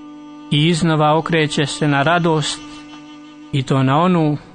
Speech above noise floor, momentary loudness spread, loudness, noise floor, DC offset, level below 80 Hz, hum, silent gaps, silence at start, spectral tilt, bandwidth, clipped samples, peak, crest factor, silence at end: 22 dB; 21 LU; -16 LUFS; -38 dBFS; under 0.1%; -50 dBFS; none; none; 0 s; -5.5 dB/octave; 9.6 kHz; under 0.1%; -2 dBFS; 14 dB; 0.1 s